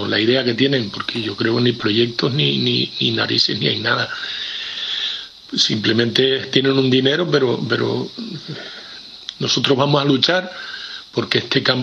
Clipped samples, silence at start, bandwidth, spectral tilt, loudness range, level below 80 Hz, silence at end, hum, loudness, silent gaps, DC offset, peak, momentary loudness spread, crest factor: under 0.1%; 0 s; 9.8 kHz; -5 dB/octave; 2 LU; -60 dBFS; 0 s; none; -17 LUFS; none; under 0.1%; 0 dBFS; 13 LU; 18 dB